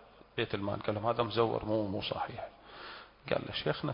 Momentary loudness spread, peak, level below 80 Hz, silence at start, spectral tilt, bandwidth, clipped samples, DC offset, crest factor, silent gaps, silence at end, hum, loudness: 16 LU; -14 dBFS; -60 dBFS; 0 s; -4 dB/octave; 5.4 kHz; under 0.1%; under 0.1%; 22 dB; none; 0 s; none; -34 LUFS